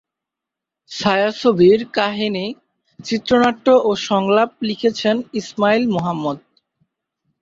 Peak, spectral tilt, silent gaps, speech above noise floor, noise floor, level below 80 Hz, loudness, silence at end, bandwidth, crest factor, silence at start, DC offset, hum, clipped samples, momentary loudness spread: -2 dBFS; -5.5 dB/octave; none; 68 dB; -85 dBFS; -58 dBFS; -17 LUFS; 1.05 s; 7.8 kHz; 16 dB; 0.9 s; under 0.1%; none; under 0.1%; 12 LU